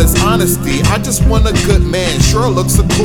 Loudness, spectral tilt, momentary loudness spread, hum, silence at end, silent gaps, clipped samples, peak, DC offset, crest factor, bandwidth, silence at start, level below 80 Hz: -12 LUFS; -5 dB/octave; 2 LU; none; 0 s; none; 0.1%; 0 dBFS; under 0.1%; 10 dB; 19 kHz; 0 s; -16 dBFS